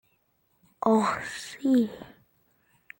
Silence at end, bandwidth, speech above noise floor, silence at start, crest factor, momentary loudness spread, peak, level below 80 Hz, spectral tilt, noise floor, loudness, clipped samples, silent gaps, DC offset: 0.95 s; 17 kHz; 45 dB; 0.85 s; 20 dB; 11 LU; -10 dBFS; -68 dBFS; -5.5 dB/octave; -71 dBFS; -27 LUFS; under 0.1%; none; under 0.1%